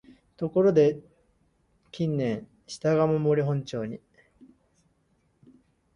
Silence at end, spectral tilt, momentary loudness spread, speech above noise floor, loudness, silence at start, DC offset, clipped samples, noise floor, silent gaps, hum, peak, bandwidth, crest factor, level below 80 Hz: 2 s; -7.5 dB/octave; 19 LU; 44 dB; -26 LUFS; 0.4 s; under 0.1%; under 0.1%; -69 dBFS; none; none; -8 dBFS; 10.5 kHz; 20 dB; -64 dBFS